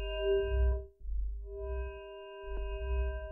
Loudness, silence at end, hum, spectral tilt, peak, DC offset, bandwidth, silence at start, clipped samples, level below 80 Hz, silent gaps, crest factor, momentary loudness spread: -37 LUFS; 0 s; none; -9.5 dB/octave; -20 dBFS; under 0.1%; 3 kHz; 0 s; under 0.1%; -36 dBFS; none; 14 dB; 13 LU